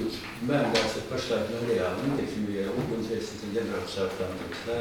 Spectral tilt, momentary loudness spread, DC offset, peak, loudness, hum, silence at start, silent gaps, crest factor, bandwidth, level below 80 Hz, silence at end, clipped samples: -5 dB/octave; 8 LU; under 0.1%; -10 dBFS; -30 LUFS; none; 0 s; none; 18 dB; 19 kHz; -54 dBFS; 0 s; under 0.1%